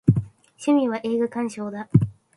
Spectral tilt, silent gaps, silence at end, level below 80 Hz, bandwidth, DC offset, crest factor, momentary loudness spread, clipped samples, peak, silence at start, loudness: -8 dB/octave; none; 0.25 s; -48 dBFS; 11.5 kHz; under 0.1%; 20 dB; 9 LU; under 0.1%; -4 dBFS; 0.05 s; -24 LUFS